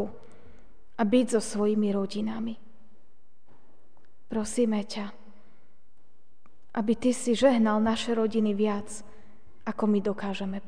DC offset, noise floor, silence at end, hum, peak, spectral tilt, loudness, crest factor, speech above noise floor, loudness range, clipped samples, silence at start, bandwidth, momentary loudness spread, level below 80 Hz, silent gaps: 1%; -69 dBFS; 0.1 s; none; -10 dBFS; -5.5 dB/octave; -27 LUFS; 20 dB; 43 dB; 8 LU; under 0.1%; 0 s; 10 kHz; 14 LU; -60 dBFS; none